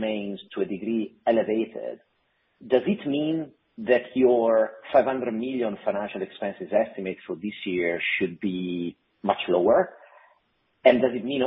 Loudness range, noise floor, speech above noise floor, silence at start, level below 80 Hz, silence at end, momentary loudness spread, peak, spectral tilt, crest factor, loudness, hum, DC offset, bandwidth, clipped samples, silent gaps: 4 LU; -69 dBFS; 45 dB; 0 s; -64 dBFS; 0 s; 13 LU; -4 dBFS; -10 dB/octave; 22 dB; -25 LUFS; none; under 0.1%; 5.6 kHz; under 0.1%; none